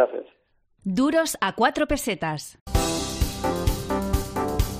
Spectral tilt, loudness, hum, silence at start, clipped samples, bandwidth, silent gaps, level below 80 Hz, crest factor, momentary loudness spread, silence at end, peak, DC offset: -4.5 dB/octave; -25 LUFS; none; 0 s; under 0.1%; 15.5 kHz; 2.61-2.66 s; -32 dBFS; 18 dB; 7 LU; 0 s; -6 dBFS; under 0.1%